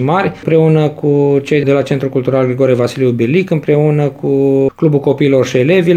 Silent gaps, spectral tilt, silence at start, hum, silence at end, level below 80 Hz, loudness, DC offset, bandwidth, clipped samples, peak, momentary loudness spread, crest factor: none; -8 dB/octave; 0 s; none; 0 s; -50 dBFS; -12 LUFS; 0.2%; 9.4 kHz; under 0.1%; 0 dBFS; 3 LU; 12 dB